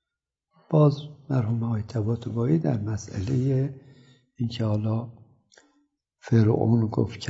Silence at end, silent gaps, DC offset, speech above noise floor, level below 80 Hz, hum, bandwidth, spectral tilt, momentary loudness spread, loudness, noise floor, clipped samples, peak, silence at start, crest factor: 0 s; none; under 0.1%; 63 dB; -58 dBFS; none; 7.8 kHz; -8.5 dB/octave; 10 LU; -25 LUFS; -87 dBFS; under 0.1%; -8 dBFS; 0.7 s; 18 dB